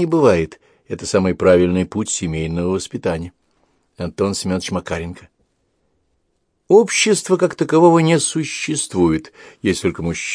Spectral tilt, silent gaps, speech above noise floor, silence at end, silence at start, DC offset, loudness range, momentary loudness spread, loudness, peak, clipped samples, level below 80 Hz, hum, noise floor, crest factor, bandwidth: -5 dB/octave; none; 51 dB; 0 s; 0 s; under 0.1%; 9 LU; 13 LU; -17 LUFS; 0 dBFS; under 0.1%; -44 dBFS; none; -67 dBFS; 18 dB; 10.5 kHz